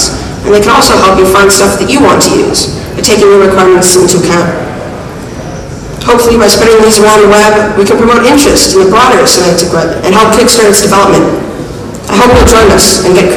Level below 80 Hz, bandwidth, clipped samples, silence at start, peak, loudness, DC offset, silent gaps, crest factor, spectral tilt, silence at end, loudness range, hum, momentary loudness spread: -24 dBFS; 16 kHz; 6%; 0 s; 0 dBFS; -4 LUFS; under 0.1%; none; 6 dB; -3.5 dB/octave; 0 s; 3 LU; none; 15 LU